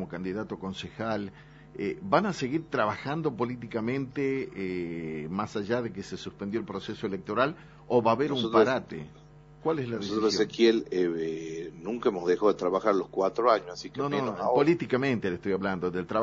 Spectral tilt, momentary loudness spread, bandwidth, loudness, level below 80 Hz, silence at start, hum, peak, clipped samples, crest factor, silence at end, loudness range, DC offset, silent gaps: -4.5 dB/octave; 12 LU; 7.6 kHz; -29 LUFS; -60 dBFS; 0 s; none; -8 dBFS; under 0.1%; 20 dB; 0 s; 6 LU; under 0.1%; none